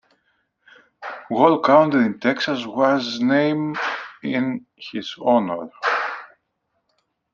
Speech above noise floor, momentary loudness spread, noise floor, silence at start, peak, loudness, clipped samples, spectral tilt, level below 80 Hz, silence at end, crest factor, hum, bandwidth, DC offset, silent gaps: 54 dB; 16 LU; -73 dBFS; 1 s; -2 dBFS; -20 LUFS; under 0.1%; -6 dB/octave; -68 dBFS; 1.05 s; 20 dB; none; 7.2 kHz; under 0.1%; none